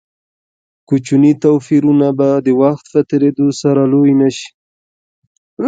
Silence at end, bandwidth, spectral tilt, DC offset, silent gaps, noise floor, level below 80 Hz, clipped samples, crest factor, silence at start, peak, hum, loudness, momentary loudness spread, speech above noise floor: 0 s; 8.6 kHz; -7.5 dB/octave; under 0.1%; 4.54-5.57 s; under -90 dBFS; -60 dBFS; under 0.1%; 12 dB; 0.9 s; 0 dBFS; none; -12 LUFS; 6 LU; over 78 dB